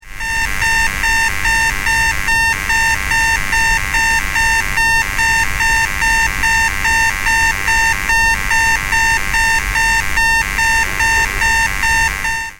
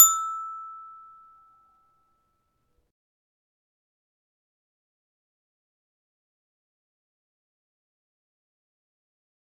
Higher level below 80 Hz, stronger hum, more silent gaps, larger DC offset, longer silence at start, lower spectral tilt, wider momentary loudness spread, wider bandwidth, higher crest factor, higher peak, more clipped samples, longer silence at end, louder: first, -26 dBFS vs -74 dBFS; neither; neither; neither; about the same, 0.05 s vs 0 s; first, -1 dB/octave vs 3.5 dB/octave; second, 1 LU vs 25 LU; first, 16.5 kHz vs 12.5 kHz; second, 12 dB vs 32 dB; about the same, -2 dBFS vs 0 dBFS; neither; second, 0.05 s vs 8.5 s; first, -13 LUFS vs -23 LUFS